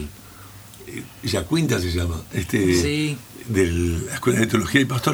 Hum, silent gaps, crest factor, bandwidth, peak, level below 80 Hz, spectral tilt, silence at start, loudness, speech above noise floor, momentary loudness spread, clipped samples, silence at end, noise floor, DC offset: none; none; 22 dB; over 20 kHz; -2 dBFS; -38 dBFS; -5 dB/octave; 0 s; -22 LUFS; 21 dB; 19 LU; under 0.1%; 0 s; -42 dBFS; under 0.1%